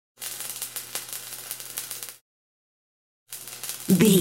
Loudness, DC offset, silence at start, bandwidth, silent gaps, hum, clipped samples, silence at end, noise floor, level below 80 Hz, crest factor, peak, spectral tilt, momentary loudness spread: -29 LUFS; under 0.1%; 0.2 s; 17 kHz; 2.21-3.26 s; none; under 0.1%; 0 s; under -90 dBFS; -68 dBFS; 24 dB; -4 dBFS; -4.5 dB/octave; 16 LU